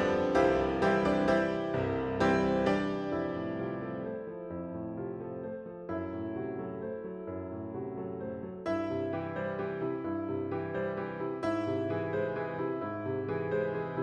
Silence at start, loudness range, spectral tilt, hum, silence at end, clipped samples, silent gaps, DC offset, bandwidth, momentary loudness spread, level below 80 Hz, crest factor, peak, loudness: 0 s; 9 LU; -7.5 dB/octave; none; 0 s; under 0.1%; none; under 0.1%; 9.4 kHz; 12 LU; -56 dBFS; 20 dB; -12 dBFS; -33 LUFS